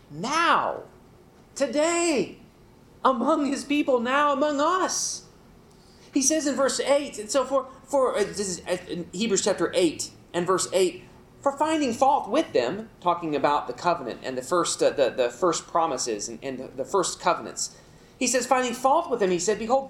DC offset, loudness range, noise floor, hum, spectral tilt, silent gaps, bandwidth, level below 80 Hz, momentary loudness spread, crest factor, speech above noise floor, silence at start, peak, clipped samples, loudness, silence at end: under 0.1%; 2 LU; -53 dBFS; none; -3 dB/octave; none; 16 kHz; -60 dBFS; 9 LU; 20 dB; 28 dB; 0.1 s; -6 dBFS; under 0.1%; -25 LUFS; 0 s